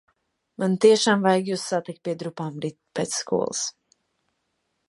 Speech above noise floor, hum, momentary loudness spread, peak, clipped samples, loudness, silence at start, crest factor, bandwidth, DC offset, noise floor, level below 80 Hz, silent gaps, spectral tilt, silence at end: 52 dB; none; 14 LU; -4 dBFS; under 0.1%; -24 LUFS; 0.6 s; 20 dB; 11.5 kHz; under 0.1%; -75 dBFS; -70 dBFS; none; -4 dB/octave; 1.2 s